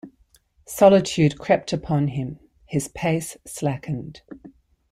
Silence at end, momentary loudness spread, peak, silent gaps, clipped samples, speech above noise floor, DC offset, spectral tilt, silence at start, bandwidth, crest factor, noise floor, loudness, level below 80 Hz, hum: 0.45 s; 18 LU; -2 dBFS; none; under 0.1%; 38 dB; under 0.1%; -6 dB/octave; 0.05 s; 15.5 kHz; 20 dB; -60 dBFS; -22 LUFS; -52 dBFS; none